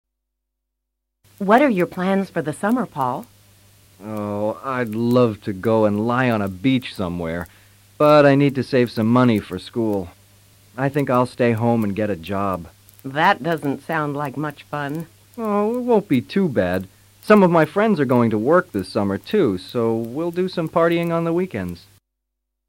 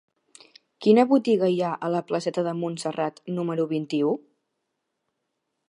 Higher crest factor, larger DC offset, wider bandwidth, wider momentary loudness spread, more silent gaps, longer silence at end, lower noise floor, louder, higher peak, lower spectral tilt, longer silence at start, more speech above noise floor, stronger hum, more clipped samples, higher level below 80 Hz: about the same, 16 dB vs 20 dB; neither; first, 16.5 kHz vs 11 kHz; first, 13 LU vs 10 LU; neither; second, 0.9 s vs 1.55 s; about the same, -79 dBFS vs -79 dBFS; first, -20 LUFS vs -24 LUFS; about the same, -4 dBFS vs -6 dBFS; about the same, -7.5 dB/octave vs -6.5 dB/octave; first, 1.4 s vs 0.8 s; first, 60 dB vs 56 dB; neither; neither; first, -56 dBFS vs -78 dBFS